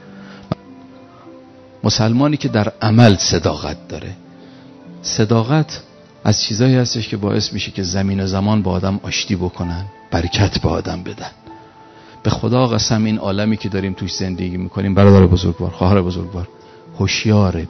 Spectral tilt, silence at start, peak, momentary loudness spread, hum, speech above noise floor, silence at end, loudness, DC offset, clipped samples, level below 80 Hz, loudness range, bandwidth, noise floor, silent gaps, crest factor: -5.5 dB/octave; 0.05 s; 0 dBFS; 16 LU; none; 26 dB; 0 s; -17 LUFS; under 0.1%; under 0.1%; -38 dBFS; 5 LU; 6.4 kHz; -42 dBFS; none; 18 dB